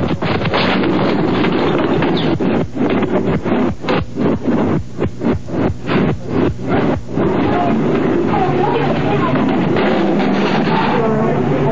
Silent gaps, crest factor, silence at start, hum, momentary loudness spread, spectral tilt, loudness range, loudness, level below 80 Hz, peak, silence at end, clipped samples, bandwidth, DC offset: none; 14 dB; 0 s; none; 4 LU; -8 dB/octave; 3 LU; -16 LUFS; -36 dBFS; -2 dBFS; 0 s; under 0.1%; 7.6 kHz; 5%